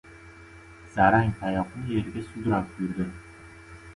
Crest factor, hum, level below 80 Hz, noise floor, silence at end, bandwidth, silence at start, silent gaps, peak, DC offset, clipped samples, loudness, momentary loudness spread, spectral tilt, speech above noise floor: 22 dB; none; -48 dBFS; -48 dBFS; 0 s; 11.5 kHz; 0.05 s; none; -6 dBFS; under 0.1%; under 0.1%; -27 LUFS; 27 LU; -8 dB/octave; 22 dB